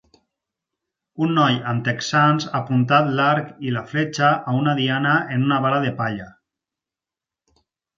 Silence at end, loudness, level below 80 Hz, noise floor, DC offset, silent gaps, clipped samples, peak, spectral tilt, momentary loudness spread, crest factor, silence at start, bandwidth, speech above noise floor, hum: 1.65 s; -20 LUFS; -62 dBFS; -89 dBFS; under 0.1%; none; under 0.1%; -2 dBFS; -6 dB/octave; 8 LU; 20 dB; 1.15 s; 7.6 kHz; 69 dB; none